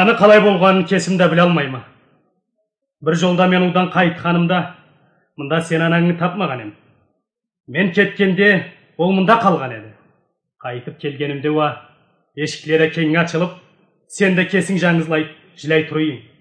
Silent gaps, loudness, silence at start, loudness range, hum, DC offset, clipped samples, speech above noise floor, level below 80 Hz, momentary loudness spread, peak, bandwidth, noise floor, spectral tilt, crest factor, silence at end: none; -16 LUFS; 0 s; 4 LU; none; under 0.1%; under 0.1%; 58 dB; -64 dBFS; 16 LU; 0 dBFS; 10 kHz; -73 dBFS; -6 dB/octave; 16 dB; 0.2 s